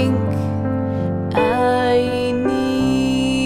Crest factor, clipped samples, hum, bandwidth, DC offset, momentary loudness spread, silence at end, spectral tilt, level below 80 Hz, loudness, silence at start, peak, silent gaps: 14 dB; under 0.1%; none; 12.5 kHz; under 0.1%; 5 LU; 0 s; -6.5 dB/octave; -42 dBFS; -19 LUFS; 0 s; -4 dBFS; none